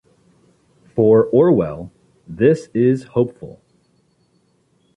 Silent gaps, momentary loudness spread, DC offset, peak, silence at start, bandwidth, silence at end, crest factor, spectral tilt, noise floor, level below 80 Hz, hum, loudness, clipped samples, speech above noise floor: none; 25 LU; under 0.1%; -2 dBFS; 0.95 s; 9.6 kHz; 1.5 s; 16 dB; -9 dB/octave; -61 dBFS; -52 dBFS; none; -16 LUFS; under 0.1%; 45 dB